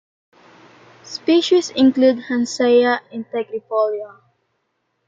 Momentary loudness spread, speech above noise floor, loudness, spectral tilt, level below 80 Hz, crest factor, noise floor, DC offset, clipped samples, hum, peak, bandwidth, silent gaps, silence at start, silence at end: 13 LU; 53 dB; -18 LUFS; -3.5 dB/octave; -66 dBFS; 16 dB; -71 dBFS; under 0.1%; under 0.1%; none; -4 dBFS; 7.8 kHz; none; 1.05 s; 1 s